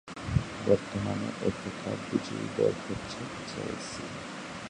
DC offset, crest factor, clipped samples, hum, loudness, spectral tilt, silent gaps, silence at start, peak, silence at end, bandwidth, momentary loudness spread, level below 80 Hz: under 0.1%; 22 dB; under 0.1%; none; -33 LUFS; -6 dB/octave; none; 0.05 s; -10 dBFS; 0 s; 11 kHz; 10 LU; -50 dBFS